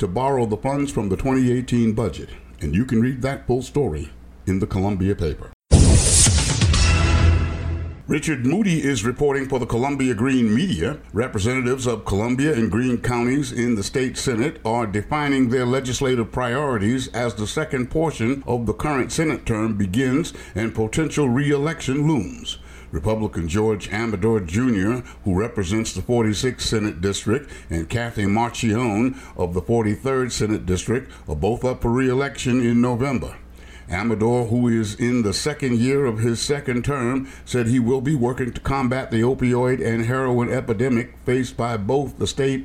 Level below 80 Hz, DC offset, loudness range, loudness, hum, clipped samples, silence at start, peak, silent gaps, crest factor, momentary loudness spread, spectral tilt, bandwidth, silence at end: -32 dBFS; under 0.1%; 5 LU; -21 LUFS; none; under 0.1%; 0 s; 0 dBFS; 5.53-5.60 s; 20 dB; 7 LU; -5.5 dB/octave; 15 kHz; 0 s